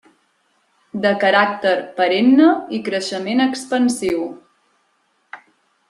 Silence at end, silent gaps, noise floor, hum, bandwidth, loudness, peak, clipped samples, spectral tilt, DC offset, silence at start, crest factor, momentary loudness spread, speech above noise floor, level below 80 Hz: 0.55 s; none; -64 dBFS; none; 12.5 kHz; -17 LUFS; -2 dBFS; under 0.1%; -4.5 dB/octave; under 0.1%; 0.95 s; 18 dB; 10 LU; 47 dB; -62 dBFS